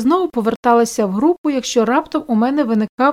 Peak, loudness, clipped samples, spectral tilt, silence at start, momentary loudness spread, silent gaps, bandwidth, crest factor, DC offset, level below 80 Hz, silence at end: -2 dBFS; -16 LUFS; under 0.1%; -5 dB/octave; 0 s; 4 LU; 0.56-0.63 s, 1.38-1.44 s, 2.89-2.98 s; 15.5 kHz; 14 dB; under 0.1%; -54 dBFS; 0 s